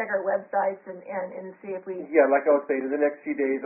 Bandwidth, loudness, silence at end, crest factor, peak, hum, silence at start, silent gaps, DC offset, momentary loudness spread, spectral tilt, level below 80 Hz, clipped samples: 2.8 kHz; -25 LUFS; 0 s; 18 dB; -6 dBFS; none; 0 s; none; under 0.1%; 16 LU; 0.5 dB/octave; -80 dBFS; under 0.1%